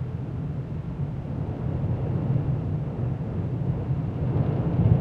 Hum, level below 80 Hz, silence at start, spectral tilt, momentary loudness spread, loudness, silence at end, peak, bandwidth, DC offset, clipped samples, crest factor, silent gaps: none; -40 dBFS; 0 s; -11 dB/octave; 7 LU; -28 LUFS; 0 s; -8 dBFS; 4.2 kHz; under 0.1%; under 0.1%; 18 dB; none